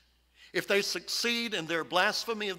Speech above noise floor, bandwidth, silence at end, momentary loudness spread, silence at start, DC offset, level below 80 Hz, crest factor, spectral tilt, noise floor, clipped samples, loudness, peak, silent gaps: 30 dB; 16 kHz; 0 s; 5 LU; 0.4 s; under 0.1%; -72 dBFS; 20 dB; -2 dB/octave; -61 dBFS; under 0.1%; -29 LUFS; -12 dBFS; none